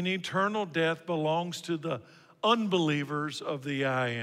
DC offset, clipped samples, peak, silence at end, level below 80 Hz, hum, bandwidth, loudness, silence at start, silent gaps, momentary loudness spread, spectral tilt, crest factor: under 0.1%; under 0.1%; -12 dBFS; 0 s; -78 dBFS; none; 15.5 kHz; -30 LUFS; 0 s; none; 7 LU; -5.5 dB/octave; 18 dB